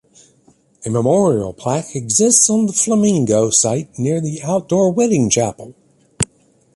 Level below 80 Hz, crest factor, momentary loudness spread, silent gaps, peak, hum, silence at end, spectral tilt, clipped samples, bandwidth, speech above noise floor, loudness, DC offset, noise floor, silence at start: -50 dBFS; 16 dB; 11 LU; none; 0 dBFS; none; 0.5 s; -4.5 dB/octave; under 0.1%; 11.5 kHz; 39 dB; -15 LUFS; under 0.1%; -55 dBFS; 0.8 s